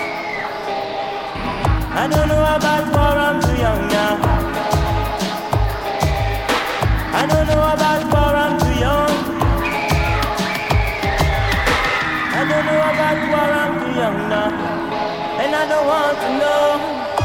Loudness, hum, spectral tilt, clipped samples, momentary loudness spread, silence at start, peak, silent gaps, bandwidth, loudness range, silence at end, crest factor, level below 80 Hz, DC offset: -18 LUFS; none; -5.5 dB/octave; under 0.1%; 6 LU; 0 s; -2 dBFS; none; 17 kHz; 2 LU; 0 s; 16 dB; -26 dBFS; under 0.1%